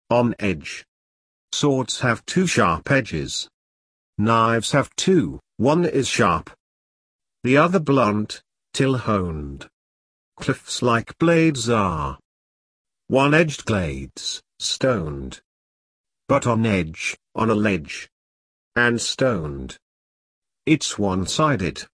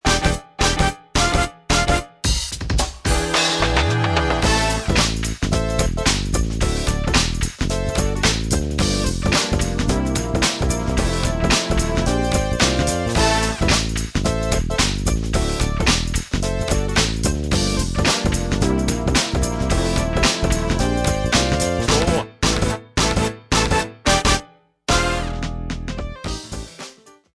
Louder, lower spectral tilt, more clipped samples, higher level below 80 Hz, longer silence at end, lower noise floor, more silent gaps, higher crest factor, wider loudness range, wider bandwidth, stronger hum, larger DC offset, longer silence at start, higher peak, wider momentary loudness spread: about the same, -21 LUFS vs -20 LUFS; about the same, -5 dB/octave vs -4 dB/octave; neither; second, -46 dBFS vs -26 dBFS; second, 0.1 s vs 0.25 s; first, under -90 dBFS vs -42 dBFS; first, 0.88-1.48 s, 3.54-4.13 s, 6.60-7.19 s, 9.73-10.32 s, 12.25-12.85 s, 15.45-16.04 s, 18.12-18.72 s, 19.82-20.42 s vs none; about the same, 20 dB vs 18 dB; about the same, 3 LU vs 2 LU; about the same, 11 kHz vs 11 kHz; neither; neither; about the same, 0.1 s vs 0.05 s; about the same, -2 dBFS vs -2 dBFS; first, 14 LU vs 5 LU